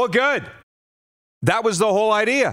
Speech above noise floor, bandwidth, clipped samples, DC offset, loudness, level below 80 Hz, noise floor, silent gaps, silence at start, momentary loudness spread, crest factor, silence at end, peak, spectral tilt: over 71 dB; 16 kHz; under 0.1%; under 0.1%; -19 LUFS; -60 dBFS; under -90 dBFS; 0.63-1.41 s; 0 s; 6 LU; 18 dB; 0 s; -4 dBFS; -4 dB/octave